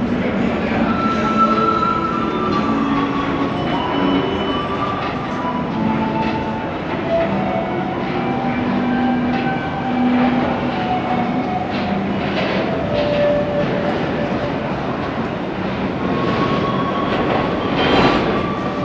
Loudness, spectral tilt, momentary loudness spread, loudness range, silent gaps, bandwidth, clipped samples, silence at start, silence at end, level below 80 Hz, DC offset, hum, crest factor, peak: -19 LUFS; -7 dB/octave; 6 LU; 3 LU; none; 8 kHz; under 0.1%; 0 s; 0 s; -38 dBFS; under 0.1%; none; 16 dB; -2 dBFS